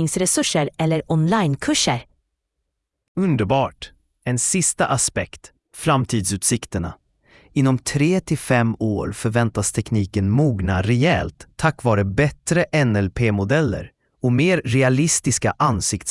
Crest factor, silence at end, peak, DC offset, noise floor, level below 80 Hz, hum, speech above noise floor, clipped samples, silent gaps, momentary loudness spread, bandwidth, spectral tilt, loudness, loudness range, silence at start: 18 dB; 0 s; -2 dBFS; under 0.1%; -77 dBFS; -44 dBFS; none; 58 dB; under 0.1%; 3.08-3.15 s; 8 LU; 12 kHz; -4.5 dB/octave; -20 LUFS; 3 LU; 0 s